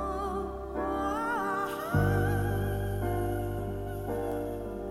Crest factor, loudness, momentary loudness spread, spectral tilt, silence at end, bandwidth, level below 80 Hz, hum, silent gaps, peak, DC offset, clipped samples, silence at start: 18 dB; -32 LUFS; 8 LU; -7 dB/octave; 0 s; 15.5 kHz; -42 dBFS; 50 Hz at -45 dBFS; none; -14 dBFS; under 0.1%; under 0.1%; 0 s